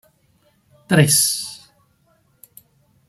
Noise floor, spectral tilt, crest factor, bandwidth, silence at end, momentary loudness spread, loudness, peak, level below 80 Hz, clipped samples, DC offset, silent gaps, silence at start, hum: -61 dBFS; -3.5 dB/octave; 22 dB; 15.5 kHz; 1.5 s; 20 LU; -16 LUFS; -2 dBFS; -58 dBFS; under 0.1%; under 0.1%; none; 0.9 s; none